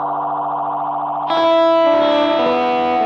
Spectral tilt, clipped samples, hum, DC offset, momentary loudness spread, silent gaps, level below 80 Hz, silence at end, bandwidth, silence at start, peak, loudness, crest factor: -5.5 dB/octave; under 0.1%; none; under 0.1%; 8 LU; none; -58 dBFS; 0 s; 7 kHz; 0 s; -4 dBFS; -16 LUFS; 10 dB